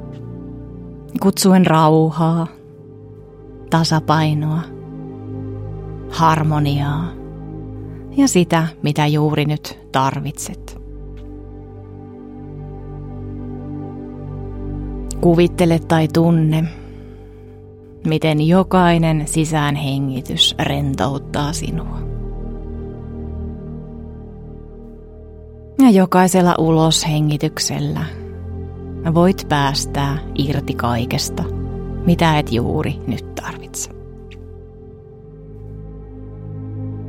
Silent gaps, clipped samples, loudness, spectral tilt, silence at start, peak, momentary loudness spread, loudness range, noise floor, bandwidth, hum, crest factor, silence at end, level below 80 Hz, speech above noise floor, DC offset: none; under 0.1%; -17 LUFS; -5.5 dB/octave; 0 s; 0 dBFS; 22 LU; 15 LU; -39 dBFS; 16.5 kHz; none; 18 dB; 0 s; -36 dBFS; 23 dB; under 0.1%